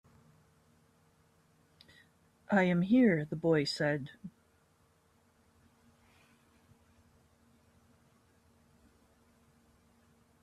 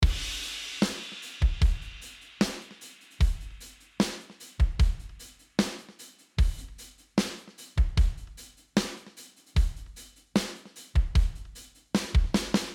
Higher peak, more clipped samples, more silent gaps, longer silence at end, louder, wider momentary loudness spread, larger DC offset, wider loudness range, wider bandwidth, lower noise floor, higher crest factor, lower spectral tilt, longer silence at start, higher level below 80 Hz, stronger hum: second, -16 dBFS vs -8 dBFS; neither; neither; first, 6.15 s vs 0 s; about the same, -30 LUFS vs -30 LUFS; about the same, 22 LU vs 20 LU; neither; first, 7 LU vs 2 LU; second, 12 kHz vs 15.5 kHz; first, -70 dBFS vs -52 dBFS; about the same, 20 dB vs 20 dB; first, -7 dB/octave vs -5 dB/octave; first, 2.5 s vs 0 s; second, -74 dBFS vs -30 dBFS; neither